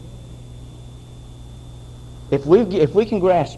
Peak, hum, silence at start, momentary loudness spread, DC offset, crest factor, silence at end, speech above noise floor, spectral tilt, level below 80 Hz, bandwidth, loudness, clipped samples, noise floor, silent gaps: -2 dBFS; none; 0 s; 24 LU; under 0.1%; 18 dB; 0 s; 22 dB; -8 dB/octave; -42 dBFS; 11.5 kHz; -17 LUFS; under 0.1%; -38 dBFS; none